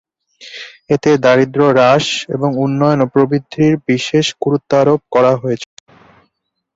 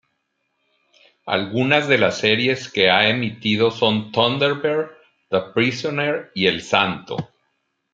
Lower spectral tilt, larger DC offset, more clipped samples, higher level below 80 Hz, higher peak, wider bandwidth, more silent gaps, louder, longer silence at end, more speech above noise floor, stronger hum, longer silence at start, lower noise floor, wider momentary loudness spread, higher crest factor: about the same, -6 dB/octave vs -5 dB/octave; neither; neither; first, -54 dBFS vs -62 dBFS; about the same, 0 dBFS vs -2 dBFS; about the same, 8 kHz vs 7.8 kHz; neither; first, -13 LUFS vs -19 LUFS; first, 1.1 s vs 0.7 s; about the same, 56 dB vs 53 dB; neither; second, 0.4 s vs 1.25 s; about the same, -69 dBFS vs -72 dBFS; first, 12 LU vs 9 LU; second, 14 dB vs 20 dB